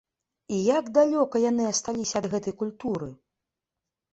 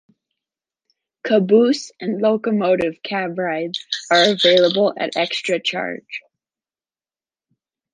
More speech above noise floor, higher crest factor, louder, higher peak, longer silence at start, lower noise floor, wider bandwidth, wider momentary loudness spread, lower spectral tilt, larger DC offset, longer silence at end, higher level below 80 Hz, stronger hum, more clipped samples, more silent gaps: second, 62 dB vs over 72 dB; about the same, 18 dB vs 18 dB; second, -26 LUFS vs -18 LUFS; second, -8 dBFS vs -2 dBFS; second, 0.5 s vs 1.25 s; about the same, -87 dBFS vs under -90 dBFS; second, 8.4 kHz vs 9.8 kHz; second, 10 LU vs 13 LU; about the same, -4.5 dB/octave vs -4.5 dB/octave; neither; second, 1 s vs 1.75 s; about the same, -64 dBFS vs -66 dBFS; neither; neither; neither